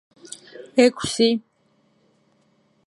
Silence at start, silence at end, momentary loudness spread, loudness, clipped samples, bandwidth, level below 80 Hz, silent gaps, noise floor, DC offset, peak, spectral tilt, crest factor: 0.55 s; 1.45 s; 22 LU; -20 LUFS; under 0.1%; 11.5 kHz; -60 dBFS; none; -64 dBFS; under 0.1%; -2 dBFS; -3.5 dB/octave; 22 dB